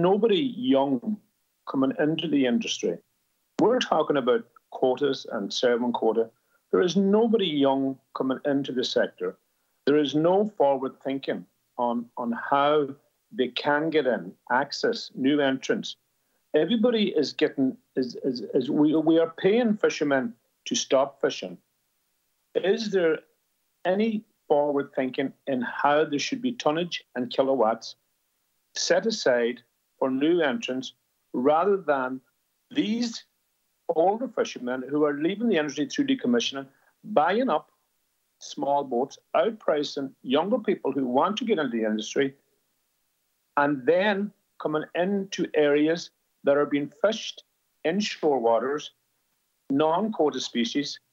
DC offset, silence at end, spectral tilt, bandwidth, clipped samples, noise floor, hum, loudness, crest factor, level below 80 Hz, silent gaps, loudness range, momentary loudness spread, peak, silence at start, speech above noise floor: under 0.1%; 0.15 s; -5 dB/octave; 8 kHz; under 0.1%; -74 dBFS; none; -26 LUFS; 20 dB; -82 dBFS; none; 3 LU; 10 LU; -6 dBFS; 0 s; 49 dB